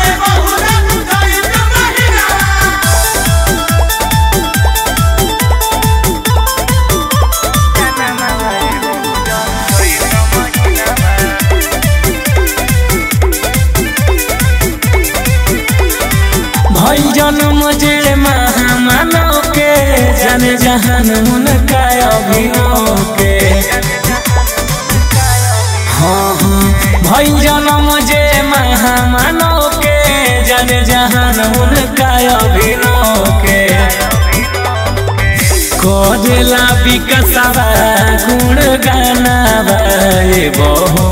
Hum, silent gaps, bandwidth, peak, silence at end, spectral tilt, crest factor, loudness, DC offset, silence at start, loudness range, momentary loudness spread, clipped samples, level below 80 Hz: none; none; 16.5 kHz; 0 dBFS; 0 s; -4 dB/octave; 10 dB; -9 LUFS; under 0.1%; 0 s; 3 LU; 3 LU; under 0.1%; -16 dBFS